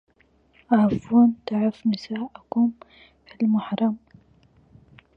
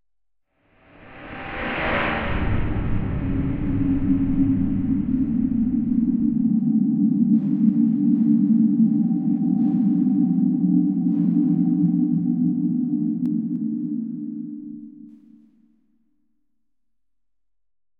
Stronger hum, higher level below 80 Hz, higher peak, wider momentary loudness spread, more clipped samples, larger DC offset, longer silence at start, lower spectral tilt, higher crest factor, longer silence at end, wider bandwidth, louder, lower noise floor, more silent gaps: neither; second, -58 dBFS vs -36 dBFS; about the same, -6 dBFS vs -6 dBFS; about the same, 10 LU vs 9 LU; neither; neither; second, 0.7 s vs 1.05 s; second, -8.5 dB/octave vs -11 dB/octave; about the same, 18 dB vs 14 dB; second, 1.2 s vs 2.9 s; first, 6 kHz vs 4.3 kHz; about the same, -23 LUFS vs -21 LUFS; second, -61 dBFS vs -87 dBFS; neither